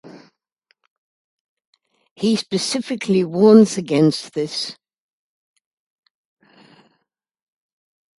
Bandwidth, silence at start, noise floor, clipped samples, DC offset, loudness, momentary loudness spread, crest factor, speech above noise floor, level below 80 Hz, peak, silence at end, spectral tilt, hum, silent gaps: 11.5 kHz; 0.05 s; -72 dBFS; under 0.1%; under 0.1%; -17 LUFS; 13 LU; 22 dB; 56 dB; -66 dBFS; 0 dBFS; 3.45 s; -5.5 dB/octave; none; 0.52-0.56 s, 0.90-1.57 s, 1.65-1.73 s, 2.11-2.16 s